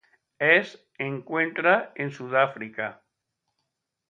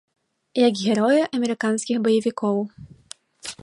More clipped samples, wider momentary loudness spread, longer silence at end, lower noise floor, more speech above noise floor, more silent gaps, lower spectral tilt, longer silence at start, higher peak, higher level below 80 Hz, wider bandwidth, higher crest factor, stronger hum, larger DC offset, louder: neither; about the same, 14 LU vs 16 LU; first, 1.15 s vs 0.1 s; first, -81 dBFS vs -47 dBFS; first, 56 dB vs 26 dB; neither; about the same, -6 dB/octave vs -5 dB/octave; second, 0.4 s vs 0.55 s; about the same, -4 dBFS vs -6 dBFS; second, -78 dBFS vs -64 dBFS; second, 7.6 kHz vs 11.5 kHz; first, 22 dB vs 16 dB; neither; neither; second, -25 LUFS vs -21 LUFS